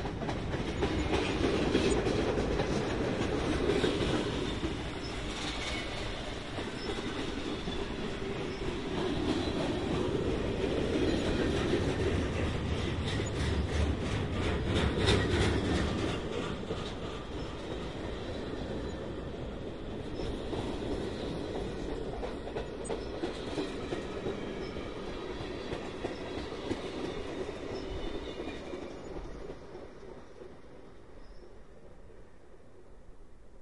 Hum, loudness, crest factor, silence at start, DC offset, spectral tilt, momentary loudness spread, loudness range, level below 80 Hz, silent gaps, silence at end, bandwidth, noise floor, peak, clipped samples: none; -34 LUFS; 20 dB; 0 s; 0.3%; -5.5 dB/octave; 11 LU; 11 LU; -44 dBFS; none; 0 s; 11.5 kHz; -56 dBFS; -14 dBFS; under 0.1%